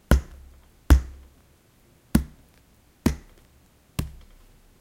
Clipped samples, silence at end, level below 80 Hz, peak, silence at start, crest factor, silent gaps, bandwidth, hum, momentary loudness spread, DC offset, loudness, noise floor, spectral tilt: under 0.1%; 0.7 s; -30 dBFS; -2 dBFS; 0.1 s; 26 dB; none; 16.5 kHz; none; 20 LU; under 0.1%; -26 LUFS; -58 dBFS; -6.5 dB/octave